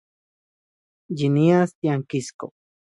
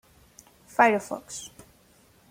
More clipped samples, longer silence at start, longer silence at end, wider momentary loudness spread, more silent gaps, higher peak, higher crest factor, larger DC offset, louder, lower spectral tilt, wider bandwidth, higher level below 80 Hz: neither; first, 1.1 s vs 0.8 s; second, 0.4 s vs 0.85 s; about the same, 19 LU vs 17 LU; first, 1.75-1.82 s, 2.34-2.39 s vs none; about the same, -6 dBFS vs -6 dBFS; second, 18 dB vs 24 dB; neither; first, -21 LUFS vs -24 LUFS; first, -7.5 dB/octave vs -3.5 dB/octave; second, 11.5 kHz vs 16.5 kHz; about the same, -66 dBFS vs -66 dBFS